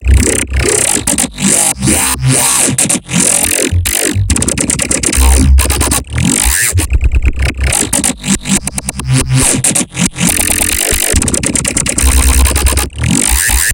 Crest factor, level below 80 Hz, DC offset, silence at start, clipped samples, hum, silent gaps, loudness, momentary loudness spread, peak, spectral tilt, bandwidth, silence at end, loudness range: 10 dB; -16 dBFS; under 0.1%; 0 s; 0.2%; none; none; -10 LUFS; 5 LU; 0 dBFS; -3 dB/octave; 18 kHz; 0 s; 2 LU